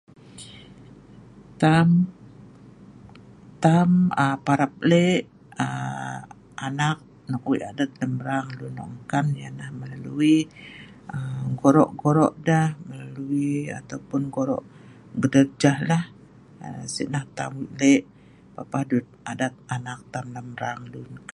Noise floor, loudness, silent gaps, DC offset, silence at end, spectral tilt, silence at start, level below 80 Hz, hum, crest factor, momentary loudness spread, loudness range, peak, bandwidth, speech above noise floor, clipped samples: -47 dBFS; -24 LUFS; none; under 0.1%; 0.15 s; -6.5 dB/octave; 0.3 s; -60 dBFS; none; 22 dB; 18 LU; 6 LU; -2 dBFS; 11.5 kHz; 25 dB; under 0.1%